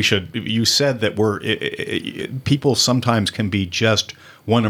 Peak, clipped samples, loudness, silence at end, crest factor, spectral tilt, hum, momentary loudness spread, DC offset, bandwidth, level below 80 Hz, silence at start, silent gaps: -2 dBFS; under 0.1%; -19 LUFS; 0 s; 18 dB; -4 dB/octave; none; 9 LU; under 0.1%; 18 kHz; -58 dBFS; 0 s; none